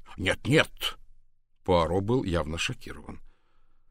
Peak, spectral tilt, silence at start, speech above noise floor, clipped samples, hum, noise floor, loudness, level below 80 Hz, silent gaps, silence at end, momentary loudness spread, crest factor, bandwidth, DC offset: -6 dBFS; -5 dB/octave; 0.05 s; 30 dB; under 0.1%; none; -57 dBFS; -27 LUFS; -46 dBFS; none; 0.65 s; 18 LU; 24 dB; 16 kHz; under 0.1%